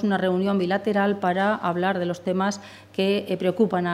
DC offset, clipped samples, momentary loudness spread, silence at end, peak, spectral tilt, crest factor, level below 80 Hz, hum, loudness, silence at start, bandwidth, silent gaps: under 0.1%; under 0.1%; 4 LU; 0 s; -8 dBFS; -6.5 dB/octave; 14 dB; -70 dBFS; none; -24 LUFS; 0 s; 13.5 kHz; none